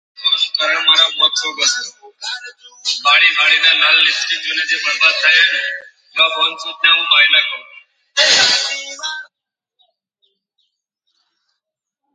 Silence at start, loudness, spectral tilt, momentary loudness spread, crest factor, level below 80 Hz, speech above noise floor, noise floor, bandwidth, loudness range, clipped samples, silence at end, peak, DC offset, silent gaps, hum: 0.2 s; -12 LUFS; 2.5 dB/octave; 16 LU; 16 dB; -68 dBFS; 64 dB; -79 dBFS; 10.5 kHz; 6 LU; under 0.1%; 2.9 s; 0 dBFS; under 0.1%; none; none